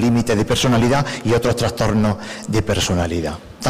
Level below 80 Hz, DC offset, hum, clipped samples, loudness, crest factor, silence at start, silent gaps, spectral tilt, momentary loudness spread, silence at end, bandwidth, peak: -36 dBFS; under 0.1%; none; under 0.1%; -18 LUFS; 8 dB; 0 s; none; -5.5 dB/octave; 7 LU; 0 s; 16 kHz; -10 dBFS